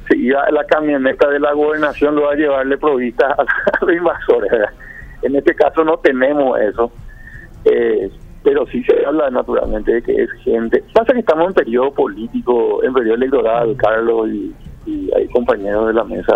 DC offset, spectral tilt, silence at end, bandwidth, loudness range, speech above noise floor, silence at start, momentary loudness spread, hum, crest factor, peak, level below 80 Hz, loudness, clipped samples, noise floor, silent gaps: under 0.1%; -7.5 dB/octave; 0 s; 6.2 kHz; 2 LU; 20 dB; 0 s; 6 LU; none; 14 dB; 0 dBFS; -38 dBFS; -15 LUFS; under 0.1%; -34 dBFS; none